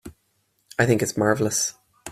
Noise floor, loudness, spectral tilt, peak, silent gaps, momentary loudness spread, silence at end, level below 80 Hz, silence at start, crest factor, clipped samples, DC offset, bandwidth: -69 dBFS; -22 LUFS; -4 dB/octave; -4 dBFS; none; 10 LU; 0 s; -56 dBFS; 0.05 s; 20 dB; under 0.1%; under 0.1%; 15.5 kHz